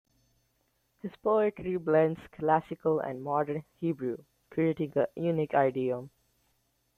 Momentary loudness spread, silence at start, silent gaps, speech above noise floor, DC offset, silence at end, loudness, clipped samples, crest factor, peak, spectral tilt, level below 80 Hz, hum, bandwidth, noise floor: 10 LU; 1.05 s; none; 45 dB; under 0.1%; 0.9 s; -30 LUFS; under 0.1%; 20 dB; -10 dBFS; -9 dB/octave; -68 dBFS; none; 14 kHz; -74 dBFS